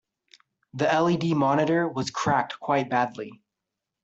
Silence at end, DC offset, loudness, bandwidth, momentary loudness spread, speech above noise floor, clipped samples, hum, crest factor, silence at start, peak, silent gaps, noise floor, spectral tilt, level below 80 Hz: 0.7 s; under 0.1%; -25 LUFS; 8.2 kHz; 10 LU; 61 dB; under 0.1%; none; 16 dB; 0.75 s; -10 dBFS; none; -85 dBFS; -6 dB/octave; -64 dBFS